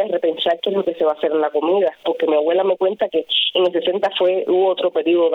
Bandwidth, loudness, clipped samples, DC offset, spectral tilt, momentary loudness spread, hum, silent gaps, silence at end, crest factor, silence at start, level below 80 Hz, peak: 5.4 kHz; -18 LUFS; under 0.1%; under 0.1%; -6 dB/octave; 3 LU; none; none; 0 s; 12 dB; 0 s; -66 dBFS; -6 dBFS